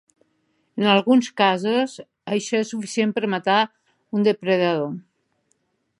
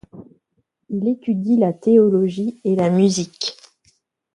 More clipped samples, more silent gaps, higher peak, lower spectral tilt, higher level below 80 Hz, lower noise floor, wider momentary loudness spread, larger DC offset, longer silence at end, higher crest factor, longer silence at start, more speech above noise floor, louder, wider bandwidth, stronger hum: neither; neither; about the same, -2 dBFS vs -4 dBFS; second, -5 dB/octave vs -6.5 dB/octave; second, -74 dBFS vs -62 dBFS; about the same, -70 dBFS vs -70 dBFS; about the same, 11 LU vs 12 LU; neither; first, 1 s vs 0.8 s; about the same, 20 dB vs 16 dB; first, 0.75 s vs 0.15 s; second, 49 dB vs 53 dB; second, -21 LUFS vs -18 LUFS; about the same, 11.5 kHz vs 11.5 kHz; neither